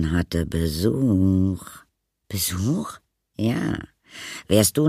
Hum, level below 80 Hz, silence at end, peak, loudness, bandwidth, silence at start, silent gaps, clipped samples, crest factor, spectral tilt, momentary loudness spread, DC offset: none; -40 dBFS; 0 s; -4 dBFS; -23 LUFS; 15.5 kHz; 0 s; none; under 0.1%; 20 dB; -5.5 dB/octave; 16 LU; under 0.1%